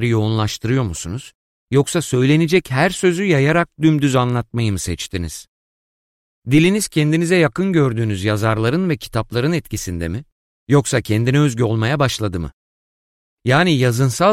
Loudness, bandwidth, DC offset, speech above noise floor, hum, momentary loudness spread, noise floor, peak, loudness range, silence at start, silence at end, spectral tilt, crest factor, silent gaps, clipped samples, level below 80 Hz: -17 LUFS; 16 kHz; under 0.1%; over 73 dB; none; 11 LU; under -90 dBFS; -2 dBFS; 3 LU; 0 s; 0 s; -5.5 dB/octave; 16 dB; 1.35-1.67 s, 5.48-6.42 s, 10.32-10.67 s, 12.53-13.37 s; under 0.1%; -42 dBFS